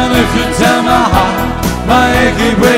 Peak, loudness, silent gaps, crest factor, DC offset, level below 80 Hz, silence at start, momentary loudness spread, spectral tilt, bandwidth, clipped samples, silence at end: 0 dBFS; -10 LUFS; none; 10 dB; under 0.1%; -22 dBFS; 0 s; 5 LU; -5 dB/octave; 16.5 kHz; under 0.1%; 0 s